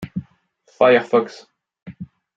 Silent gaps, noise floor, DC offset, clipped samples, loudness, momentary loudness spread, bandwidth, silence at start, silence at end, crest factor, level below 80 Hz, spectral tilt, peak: 1.82-1.86 s; -59 dBFS; under 0.1%; under 0.1%; -16 LUFS; 23 LU; 7.6 kHz; 0 s; 0.35 s; 20 dB; -60 dBFS; -6.5 dB/octave; -2 dBFS